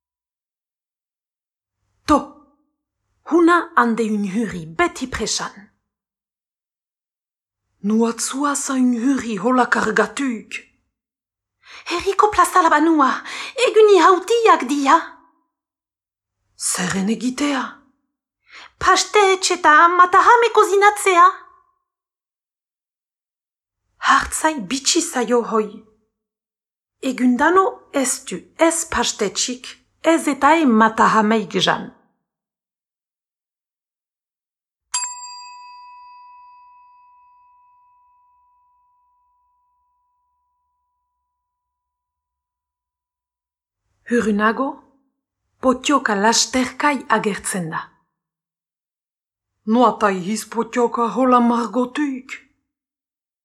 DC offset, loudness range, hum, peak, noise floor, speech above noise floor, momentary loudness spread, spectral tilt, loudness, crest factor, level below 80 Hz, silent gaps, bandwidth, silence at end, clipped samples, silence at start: under 0.1%; 12 LU; none; -2 dBFS; under -90 dBFS; over 73 dB; 14 LU; -3 dB/octave; -17 LUFS; 18 dB; -54 dBFS; none; 14 kHz; 1.05 s; under 0.1%; 2.1 s